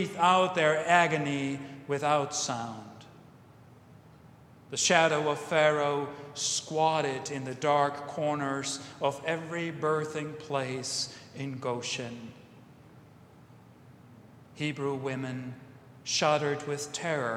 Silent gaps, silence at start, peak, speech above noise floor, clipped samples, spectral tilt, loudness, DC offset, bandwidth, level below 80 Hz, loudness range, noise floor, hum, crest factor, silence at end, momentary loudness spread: none; 0 s; -6 dBFS; 25 dB; under 0.1%; -3.5 dB/octave; -29 LUFS; under 0.1%; 15 kHz; -72 dBFS; 11 LU; -54 dBFS; none; 24 dB; 0 s; 14 LU